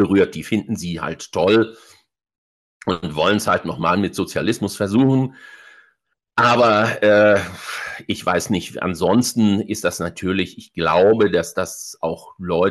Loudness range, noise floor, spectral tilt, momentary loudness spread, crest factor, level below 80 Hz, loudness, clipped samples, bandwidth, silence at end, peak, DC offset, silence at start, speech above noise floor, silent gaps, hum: 4 LU; -65 dBFS; -5 dB/octave; 12 LU; 14 dB; -52 dBFS; -19 LUFS; under 0.1%; 12.5 kHz; 0 s; -6 dBFS; under 0.1%; 0 s; 47 dB; 2.38-2.80 s; none